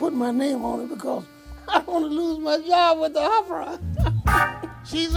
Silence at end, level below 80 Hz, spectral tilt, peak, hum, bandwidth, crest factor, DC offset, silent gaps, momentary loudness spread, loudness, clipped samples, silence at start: 0 s; -36 dBFS; -6 dB/octave; -6 dBFS; none; 19.5 kHz; 16 dB; under 0.1%; none; 11 LU; -23 LUFS; under 0.1%; 0 s